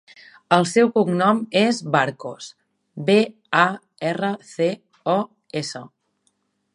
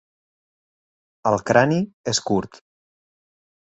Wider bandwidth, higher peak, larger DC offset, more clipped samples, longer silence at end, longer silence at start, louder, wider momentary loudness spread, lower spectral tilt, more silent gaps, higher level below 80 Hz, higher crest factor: first, 11.5 kHz vs 8.2 kHz; about the same, 0 dBFS vs -2 dBFS; neither; neither; second, 0.9 s vs 1.3 s; second, 0.5 s vs 1.25 s; about the same, -21 LUFS vs -21 LUFS; first, 15 LU vs 9 LU; about the same, -5 dB/octave vs -4.5 dB/octave; second, none vs 1.94-2.04 s; second, -72 dBFS vs -58 dBFS; about the same, 22 dB vs 22 dB